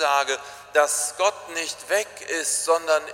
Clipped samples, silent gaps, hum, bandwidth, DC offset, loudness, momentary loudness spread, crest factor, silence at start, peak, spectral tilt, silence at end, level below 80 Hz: under 0.1%; none; none; 16.5 kHz; under 0.1%; -23 LUFS; 8 LU; 18 dB; 0 s; -6 dBFS; 1 dB/octave; 0 s; -70 dBFS